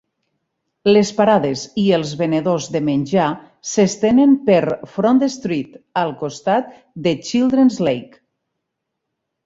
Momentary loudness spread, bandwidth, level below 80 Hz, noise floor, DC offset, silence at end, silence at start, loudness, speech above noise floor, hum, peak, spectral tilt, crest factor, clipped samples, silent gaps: 9 LU; 7.8 kHz; -58 dBFS; -78 dBFS; under 0.1%; 1.4 s; 0.85 s; -17 LUFS; 61 dB; none; -2 dBFS; -5.5 dB/octave; 16 dB; under 0.1%; none